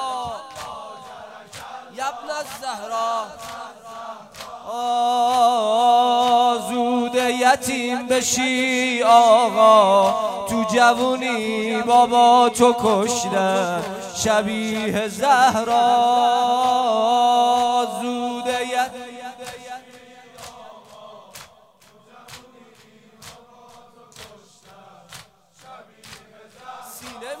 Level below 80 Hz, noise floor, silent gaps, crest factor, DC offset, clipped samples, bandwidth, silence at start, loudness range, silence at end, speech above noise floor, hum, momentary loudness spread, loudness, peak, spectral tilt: -60 dBFS; -52 dBFS; none; 18 dB; under 0.1%; under 0.1%; 16 kHz; 0 s; 13 LU; 0 s; 35 dB; none; 22 LU; -18 LUFS; -2 dBFS; -3 dB/octave